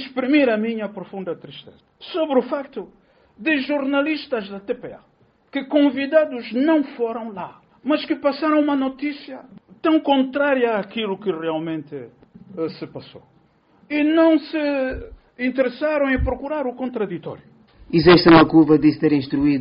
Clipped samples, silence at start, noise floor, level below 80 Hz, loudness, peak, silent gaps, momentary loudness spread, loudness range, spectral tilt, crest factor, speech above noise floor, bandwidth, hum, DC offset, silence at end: under 0.1%; 0 s; -57 dBFS; -44 dBFS; -20 LUFS; -2 dBFS; none; 19 LU; 8 LU; -4.5 dB/octave; 20 dB; 38 dB; 5.4 kHz; none; under 0.1%; 0 s